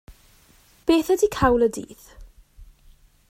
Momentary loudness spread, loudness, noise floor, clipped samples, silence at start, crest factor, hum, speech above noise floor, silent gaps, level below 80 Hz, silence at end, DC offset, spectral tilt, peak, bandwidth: 15 LU; -21 LUFS; -56 dBFS; under 0.1%; 0.1 s; 20 dB; none; 35 dB; none; -44 dBFS; 0.65 s; under 0.1%; -5 dB/octave; -4 dBFS; 16 kHz